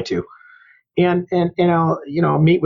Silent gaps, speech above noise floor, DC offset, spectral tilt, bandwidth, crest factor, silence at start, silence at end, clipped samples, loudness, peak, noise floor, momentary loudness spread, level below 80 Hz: none; 33 dB; under 0.1%; -8.5 dB/octave; 7.4 kHz; 12 dB; 0 s; 0 s; under 0.1%; -18 LUFS; -4 dBFS; -50 dBFS; 10 LU; -52 dBFS